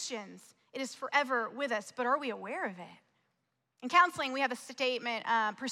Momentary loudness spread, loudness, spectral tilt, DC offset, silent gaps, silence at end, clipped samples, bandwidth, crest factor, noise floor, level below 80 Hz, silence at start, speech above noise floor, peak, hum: 17 LU; -32 LUFS; -2.5 dB/octave; under 0.1%; none; 0 s; under 0.1%; 15 kHz; 22 dB; -82 dBFS; -88 dBFS; 0 s; 48 dB; -12 dBFS; none